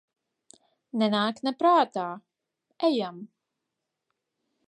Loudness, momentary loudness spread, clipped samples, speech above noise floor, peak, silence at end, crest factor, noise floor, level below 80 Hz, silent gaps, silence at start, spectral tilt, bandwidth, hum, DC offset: -26 LUFS; 15 LU; under 0.1%; 59 dB; -10 dBFS; 1.4 s; 20 dB; -84 dBFS; -84 dBFS; none; 0.95 s; -6 dB/octave; 10.5 kHz; none; under 0.1%